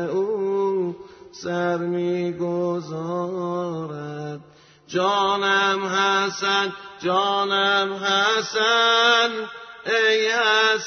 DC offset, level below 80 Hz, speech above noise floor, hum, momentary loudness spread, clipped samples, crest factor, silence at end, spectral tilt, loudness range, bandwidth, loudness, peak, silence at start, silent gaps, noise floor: under 0.1%; -68 dBFS; 29 dB; none; 14 LU; under 0.1%; 16 dB; 0 s; -3.5 dB/octave; 7 LU; 6.6 kHz; -21 LUFS; -6 dBFS; 0 s; none; -50 dBFS